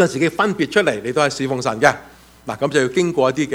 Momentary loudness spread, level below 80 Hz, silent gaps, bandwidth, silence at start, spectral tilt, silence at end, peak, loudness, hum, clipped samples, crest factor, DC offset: 7 LU; -54 dBFS; none; 16.5 kHz; 0 s; -4.5 dB/octave; 0 s; 0 dBFS; -18 LUFS; none; under 0.1%; 18 dB; under 0.1%